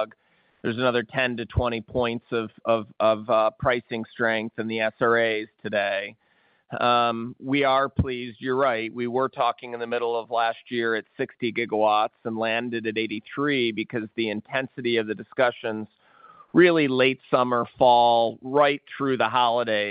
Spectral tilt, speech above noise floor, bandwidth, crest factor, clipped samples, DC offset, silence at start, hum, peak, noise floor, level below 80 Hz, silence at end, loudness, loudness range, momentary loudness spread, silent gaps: -10 dB/octave; 28 dB; 5.2 kHz; 20 dB; under 0.1%; under 0.1%; 0 s; none; -4 dBFS; -52 dBFS; -50 dBFS; 0 s; -24 LUFS; 5 LU; 9 LU; none